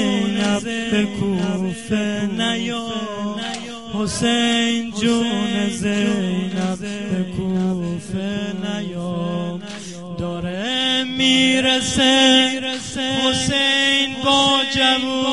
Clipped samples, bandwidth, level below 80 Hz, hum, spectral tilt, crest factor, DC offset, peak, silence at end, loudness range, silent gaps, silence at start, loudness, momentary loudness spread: under 0.1%; 11.5 kHz; -48 dBFS; none; -3.5 dB/octave; 18 dB; 0.5%; -2 dBFS; 0 s; 9 LU; none; 0 s; -19 LUFS; 11 LU